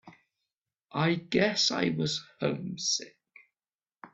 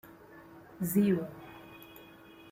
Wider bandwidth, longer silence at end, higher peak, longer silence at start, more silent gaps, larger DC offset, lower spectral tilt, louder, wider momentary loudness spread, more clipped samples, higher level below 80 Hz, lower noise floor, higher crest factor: second, 8.4 kHz vs 16.5 kHz; second, 0.05 s vs 0.5 s; first, -10 dBFS vs -16 dBFS; about the same, 0.05 s vs 0.05 s; first, 0.58-0.62 s, 3.75-3.79 s vs none; neither; second, -3.5 dB/octave vs -7 dB/octave; about the same, -29 LUFS vs -31 LUFS; second, 8 LU vs 25 LU; neither; about the same, -68 dBFS vs -68 dBFS; first, under -90 dBFS vs -54 dBFS; about the same, 22 dB vs 18 dB